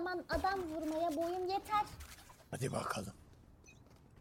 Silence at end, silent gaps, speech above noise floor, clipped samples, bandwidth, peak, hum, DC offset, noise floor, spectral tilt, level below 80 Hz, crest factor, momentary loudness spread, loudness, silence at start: 0 s; none; 23 dB; under 0.1%; 16.5 kHz; -24 dBFS; none; under 0.1%; -61 dBFS; -5 dB/octave; -58 dBFS; 16 dB; 15 LU; -39 LUFS; 0 s